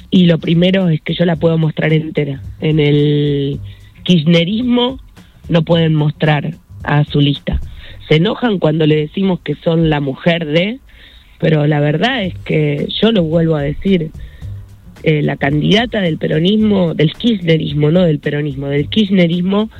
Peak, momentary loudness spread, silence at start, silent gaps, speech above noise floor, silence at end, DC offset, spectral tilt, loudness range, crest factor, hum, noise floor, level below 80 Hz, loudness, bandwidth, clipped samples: 0 dBFS; 9 LU; 0.05 s; none; 27 dB; 0 s; under 0.1%; -8 dB/octave; 2 LU; 14 dB; none; -40 dBFS; -36 dBFS; -14 LUFS; 6.8 kHz; under 0.1%